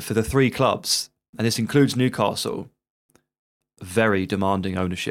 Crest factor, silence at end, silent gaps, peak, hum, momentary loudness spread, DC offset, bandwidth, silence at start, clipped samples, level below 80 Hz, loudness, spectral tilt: 18 dB; 0 s; 1.29-1.33 s, 2.90-3.09 s, 3.39-3.60 s; -4 dBFS; none; 8 LU; under 0.1%; 17 kHz; 0 s; under 0.1%; -50 dBFS; -22 LUFS; -5 dB/octave